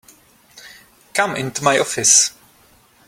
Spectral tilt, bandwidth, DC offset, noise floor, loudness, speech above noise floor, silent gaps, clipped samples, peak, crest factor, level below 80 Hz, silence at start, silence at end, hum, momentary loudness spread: -1 dB/octave; 16.5 kHz; under 0.1%; -53 dBFS; -15 LUFS; 36 dB; none; under 0.1%; 0 dBFS; 20 dB; -60 dBFS; 0.55 s; 0.8 s; none; 9 LU